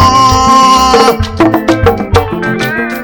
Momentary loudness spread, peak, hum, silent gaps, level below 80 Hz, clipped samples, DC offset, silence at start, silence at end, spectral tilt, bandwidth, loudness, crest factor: 8 LU; 0 dBFS; none; none; -24 dBFS; 5%; under 0.1%; 0 s; 0 s; -4.5 dB/octave; over 20 kHz; -8 LUFS; 8 dB